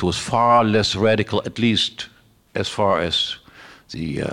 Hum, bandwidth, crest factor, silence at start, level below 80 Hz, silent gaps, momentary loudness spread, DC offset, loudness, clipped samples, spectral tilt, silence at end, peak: none; 12 kHz; 14 dB; 0 s; -50 dBFS; none; 16 LU; under 0.1%; -19 LUFS; under 0.1%; -4.5 dB/octave; 0 s; -6 dBFS